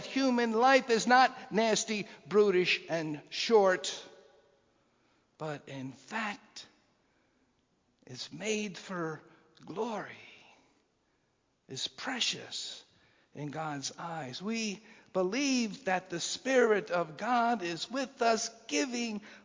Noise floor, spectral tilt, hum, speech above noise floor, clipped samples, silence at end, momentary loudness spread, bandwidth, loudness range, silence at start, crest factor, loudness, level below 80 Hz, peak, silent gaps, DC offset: -75 dBFS; -3.5 dB/octave; none; 44 dB; under 0.1%; 0.05 s; 18 LU; 7.6 kHz; 15 LU; 0 s; 22 dB; -31 LUFS; -80 dBFS; -10 dBFS; none; under 0.1%